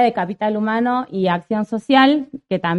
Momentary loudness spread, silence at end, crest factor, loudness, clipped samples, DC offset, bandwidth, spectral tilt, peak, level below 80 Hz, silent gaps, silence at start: 9 LU; 0 s; 16 dB; -18 LUFS; under 0.1%; under 0.1%; 10.5 kHz; -7 dB/octave; -2 dBFS; -60 dBFS; none; 0 s